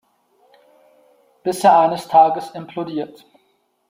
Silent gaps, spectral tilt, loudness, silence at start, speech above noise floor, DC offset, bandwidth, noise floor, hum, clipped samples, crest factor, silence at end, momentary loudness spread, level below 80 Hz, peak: none; -5 dB/octave; -17 LUFS; 1.45 s; 48 dB; under 0.1%; 16 kHz; -64 dBFS; none; under 0.1%; 18 dB; 0.85 s; 16 LU; -68 dBFS; -2 dBFS